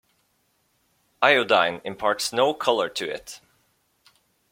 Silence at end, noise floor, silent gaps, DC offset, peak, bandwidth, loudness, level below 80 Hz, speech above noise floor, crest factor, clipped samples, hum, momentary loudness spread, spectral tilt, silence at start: 1.15 s; -69 dBFS; none; under 0.1%; -2 dBFS; 16.5 kHz; -22 LUFS; -66 dBFS; 46 dB; 24 dB; under 0.1%; none; 16 LU; -2.5 dB/octave; 1.2 s